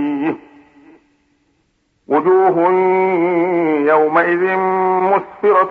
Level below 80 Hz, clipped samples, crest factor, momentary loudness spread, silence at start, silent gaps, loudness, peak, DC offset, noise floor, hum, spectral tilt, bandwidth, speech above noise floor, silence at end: -66 dBFS; under 0.1%; 14 dB; 6 LU; 0 s; none; -15 LUFS; -2 dBFS; under 0.1%; -63 dBFS; none; -9 dB/octave; 4.3 kHz; 49 dB; 0 s